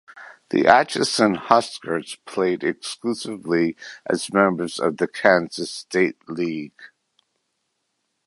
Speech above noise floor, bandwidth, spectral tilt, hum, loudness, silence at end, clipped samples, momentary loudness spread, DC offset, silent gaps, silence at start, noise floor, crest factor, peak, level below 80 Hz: 53 dB; 11.5 kHz; -4.5 dB/octave; none; -21 LUFS; 1.4 s; under 0.1%; 12 LU; under 0.1%; none; 0.15 s; -75 dBFS; 22 dB; 0 dBFS; -64 dBFS